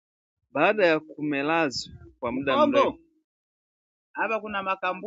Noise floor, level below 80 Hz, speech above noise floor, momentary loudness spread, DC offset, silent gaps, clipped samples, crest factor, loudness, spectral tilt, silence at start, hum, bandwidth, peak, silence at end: under -90 dBFS; -60 dBFS; over 65 dB; 13 LU; under 0.1%; 3.24-4.14 s; under 0.1%; 22 dB; -25 LUFS; -5 dB/octave; 0.55 s; none; 8 kHz; -6 dBFS; 0 s